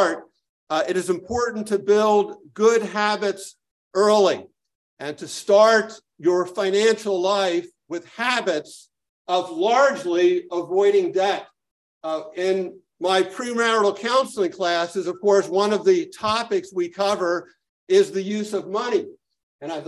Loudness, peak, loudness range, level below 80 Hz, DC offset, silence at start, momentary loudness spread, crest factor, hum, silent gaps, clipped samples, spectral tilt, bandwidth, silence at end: -21 LUFS; -4 dBFS; 3 LU; -62 dBFS; under 0.1%; 0 s; 13 LU; 18 dB; none; 0.49-0.67 s, 3.71-3.91 s, 4.75-4.97 s, 9.09-9.25 s, 11.71-12.01 s, 17.69-17.87 s, 19.43-19.59 s; under 0.1%; -4 dB/octave; 12 kHz; 0 s